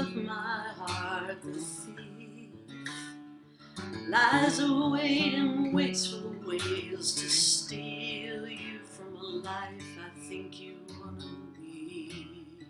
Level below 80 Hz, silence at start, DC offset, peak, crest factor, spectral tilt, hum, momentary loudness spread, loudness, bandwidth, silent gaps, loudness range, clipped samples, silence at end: -70 dBFS; 0 s; under 0.1%; -12 dBFS; 22 dB; -3 dB/octave; none; 21 LU; -30 LUFS; 14 kHz; none; 14 LU; under 0.1%; 0 s